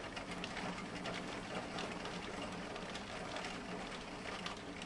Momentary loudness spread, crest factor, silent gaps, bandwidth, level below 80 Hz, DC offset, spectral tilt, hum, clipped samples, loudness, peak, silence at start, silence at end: 2 LU; 18 dB; none; 11.5 kHz; -62 dBFS; under 0.1%; -4 dB/octave; none; under 0.1%; -44 LUFS; -26 dBFS; 0 s; 0 s